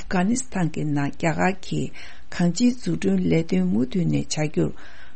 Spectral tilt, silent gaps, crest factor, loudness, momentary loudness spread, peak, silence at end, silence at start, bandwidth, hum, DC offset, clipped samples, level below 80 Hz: -6 dB/octave; none; 16 dB; -24 LUFS; 8 LU; -8 dBFS; 0.1 s; 0 s; 8.8 kHz; none; 4%; under 0.1%; -48 dBFS